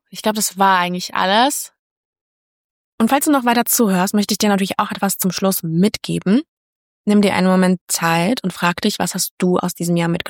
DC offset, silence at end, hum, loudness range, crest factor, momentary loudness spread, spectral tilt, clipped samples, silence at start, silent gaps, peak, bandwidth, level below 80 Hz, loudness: under 0.1%; 0 s; none; 1 LU; 14 dB; 5 LU; -4.5 dB/octave; under 0.1%; 0.15 s; 1.79-2.13 s, 2.21-2.98 s, 6.48-7.04 s, 7.81-7.87 s, 9.31-9.38 s; -4 dBFS; 19.5 kHz; -58 dBFS; -17 LUFS